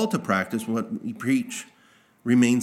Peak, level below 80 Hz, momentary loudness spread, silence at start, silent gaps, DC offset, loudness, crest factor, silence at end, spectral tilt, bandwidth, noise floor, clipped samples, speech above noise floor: -8 dBFS; -76 dBFS; 14 LU; 0 s; none; under 0.1%; -25 LUFS; 18 dB; 0 s; -5.5 dB/octave; 15.5 kHz; -58 dBFS; under 0.1%; 35 dB